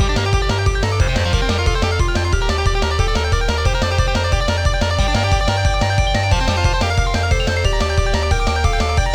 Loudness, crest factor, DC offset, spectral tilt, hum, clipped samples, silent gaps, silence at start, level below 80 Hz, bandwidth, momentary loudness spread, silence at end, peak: -17 LUFS; 12 dB; under 0.1%; -4.5 dB/octave; none; under 0.1%; none; 0 s; -20 dBFS; 12 kHz; 1 LU; 0 s; -4 dBFS